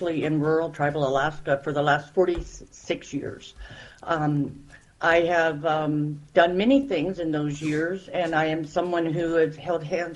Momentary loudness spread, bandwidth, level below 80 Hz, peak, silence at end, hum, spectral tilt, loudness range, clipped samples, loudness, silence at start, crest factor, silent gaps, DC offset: 12 LU; 11 kHz; -50 dBFS; -4 dBFS; 0 s; none; -6.5 dB/octave; 4 LU; under 0.1%; -25 LUFS; 0 s; 20 dB; none; under 0.1%